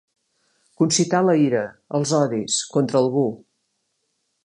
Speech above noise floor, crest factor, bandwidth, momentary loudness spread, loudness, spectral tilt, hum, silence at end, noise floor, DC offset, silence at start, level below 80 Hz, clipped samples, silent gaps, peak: 53 dB; 18 dB; 11.5 kHz; 8 LU; -20 LUFS; -4.5 dB/octave; none; 1.1 s; -73 dBFS; under 0.1%; 0.8 s; -68 dBFS; under 0.1%; none; -4 dBFS